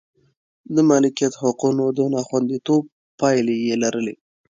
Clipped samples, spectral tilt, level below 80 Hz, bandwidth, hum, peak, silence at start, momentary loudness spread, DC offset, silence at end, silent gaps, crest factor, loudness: under 0.1%; -5.5 dB/octave; -66 dBFS; 9.2 kHz; none; -4 dBFS; 0.7 s; 7 LU; under 0.1%; 0.35 s; 2.92-3.18 s; 16 dB; -20 LUFS